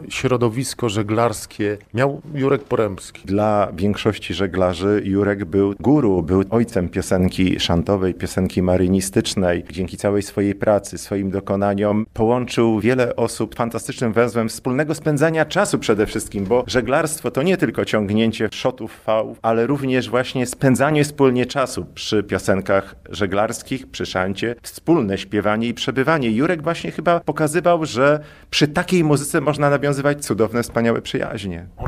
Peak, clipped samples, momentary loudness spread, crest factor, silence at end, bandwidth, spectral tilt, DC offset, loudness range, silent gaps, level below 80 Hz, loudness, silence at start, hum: -4 dBFS; under 0.1%; 7 LU; 16 dB; 0 s; 16 kHz; -5.5 dB/octave; under 0.1%; 2 LU; none; -44 dBFS; -19 LUFS; 0 s; none